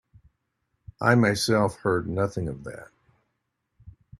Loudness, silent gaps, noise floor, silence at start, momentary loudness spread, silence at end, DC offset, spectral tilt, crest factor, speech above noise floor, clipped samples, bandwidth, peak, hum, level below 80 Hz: -24 LUFS; none; -78 dBFS; 1 s; 18 LU; 0.3 s; under 0.1%; -5.5 dB/octave; 22 dB; 54 dB; under 0.1%; 13 kHz; -4 dBFS; none; -54 dBFS